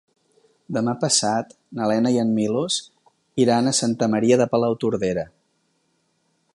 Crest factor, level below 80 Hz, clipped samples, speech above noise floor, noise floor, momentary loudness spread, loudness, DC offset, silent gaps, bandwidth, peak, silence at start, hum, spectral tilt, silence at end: 18 dB; -60 dBFS; under 0.1%; 48 dB; -68 dBFS; 10 LU; -21 LUFS; under 0.1%; none; 11.5 kHz; -4 dBFS; 0.7 s; none; -4.5 dB/octave; 1.25 s